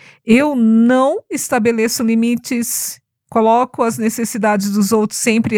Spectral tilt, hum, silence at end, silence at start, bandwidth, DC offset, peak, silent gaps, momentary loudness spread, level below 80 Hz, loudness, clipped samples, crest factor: -4.5 dB/octave; none; 0 s; 0.25 s; 17.5 kHz; under 0.1%; 0 dBFS; none; 7 LU; -58 dBFS; -15 LUFS; under 0.1%; 14 dB